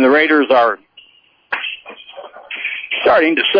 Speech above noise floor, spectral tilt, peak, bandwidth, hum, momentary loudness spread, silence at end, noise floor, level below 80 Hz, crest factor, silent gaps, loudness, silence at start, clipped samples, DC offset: 39 dB; -5.5 dB/octave; -4 dBFS; 5.2 kHz; none; 23 LU; 0 s; -51 dBFS; -58 dBFS; 12 dB; none; -15 LUFS; 0 s; under 0.1%; under 0.1%